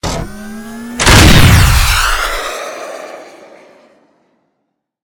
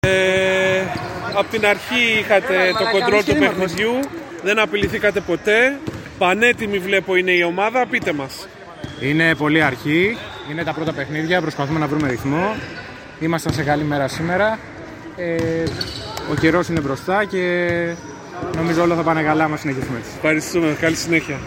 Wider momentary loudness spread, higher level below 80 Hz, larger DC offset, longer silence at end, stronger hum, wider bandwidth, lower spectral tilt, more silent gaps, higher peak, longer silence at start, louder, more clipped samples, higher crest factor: first, 22 LU vs 12 LU; first, -18 dBFS vs -46 dBFS; neither; first, 1.75 s vs 0 s; neither; first, over 20 kHz vs 16.5 kHz; about the same, -4 dB/octave vs -5 dB/octave; neither; about the same, 0 dBFS vs -2 dBFS; about the same, 0.05 s vs 0.05 s; first, -9 LUFS vs -18 LUFS; first, 1% vs under 0.1%; second, 12 dB vs 18 dB